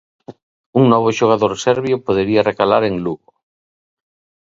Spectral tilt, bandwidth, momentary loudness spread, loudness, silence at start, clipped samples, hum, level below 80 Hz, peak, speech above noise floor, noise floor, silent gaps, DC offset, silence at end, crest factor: -6 dB/octave; 7.8 kHz; 8 LU; -16 LUFS; 0.3 s; under 0.1%; none; -52 dBFS; 0 dBFS; over 75 dB; under -90 dBFS; 0.42-0.73 s; under 0.1%; 1.35 s; 18 dB